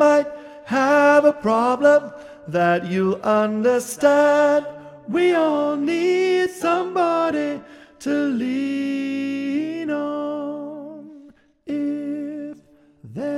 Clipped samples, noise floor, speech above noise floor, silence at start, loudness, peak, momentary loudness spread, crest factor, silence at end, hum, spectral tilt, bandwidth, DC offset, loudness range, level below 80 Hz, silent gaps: under 0.1%; -51 dBFS; 33 dB; 0 s; -20 LUFS; -4 dBFS; 18 LU; 16 dB; 0 s; none; -5.5 dB/octave; 15 kHz; under 0.1%; 9 LU; -66 dBFS; none